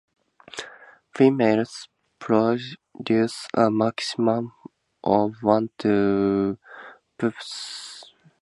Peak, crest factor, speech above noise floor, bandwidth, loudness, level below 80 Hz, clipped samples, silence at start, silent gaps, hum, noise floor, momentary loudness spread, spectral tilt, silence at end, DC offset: -4 dBFS; 20 dB; 26 dB; 11.5 kHz; -23 LUFS; -62 dBFS; under 0.1%; 0.55 s; none; none; -48 dBFS; 19 LU; -6 dB/octave; 0.4 s; under 0.1%